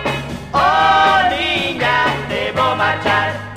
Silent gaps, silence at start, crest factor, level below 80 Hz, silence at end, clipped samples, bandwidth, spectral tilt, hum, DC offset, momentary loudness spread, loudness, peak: none; 0 s; 14 dB; -40 dBFS; 0 s; under 0.1%; 15.5 kHz; -4.5 dB/octave; none; under 0.1%; 8 LU; -15 LUFS; 0 dBFS